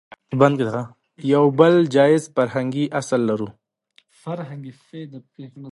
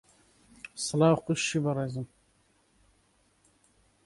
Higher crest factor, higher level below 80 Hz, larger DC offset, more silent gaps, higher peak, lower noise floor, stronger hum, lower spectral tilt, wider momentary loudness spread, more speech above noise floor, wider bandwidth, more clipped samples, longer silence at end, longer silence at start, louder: about the same, 20 dB vs 22 dB; about the same, -66 dBFS vs -66 dBFS; neither; neither; first, 0 dBFS vs -10 dBFS; second, -60 dBFS vs -68 dBFS; neither; first, -7 dB/octave vs -5 dB/octave; about the same, 23 LU vs 21 LU; about the same, 41 dB vs 41 dB; about the same, 11.5 kHz vs 11.5 kHz; neither; second, 0 s vs 2 s; second, 0.3 s vs 0.75 s; first, -19 LUFS vs -28 LUFS